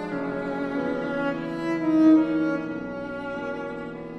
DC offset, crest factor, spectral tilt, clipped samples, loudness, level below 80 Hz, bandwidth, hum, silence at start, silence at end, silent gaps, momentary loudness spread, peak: under 0.1%; 16 dB; -8 dB/octave; under 0.1%; -25 LUFS; -58 dBFS; 6.4 kHz; none; 0 s; 0 s; none; 14 LU; -8 dBFS